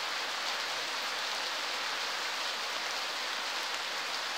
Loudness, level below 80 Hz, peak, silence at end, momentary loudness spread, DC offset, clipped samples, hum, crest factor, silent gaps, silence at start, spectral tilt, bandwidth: -33 LUFS; -82 dBFS; -18 dBFS; 0 s; 1 LU; under 0.1%; under 0.1%; none; 16 dB; none; 0 s; 1.5 dB/octave; 16 kHz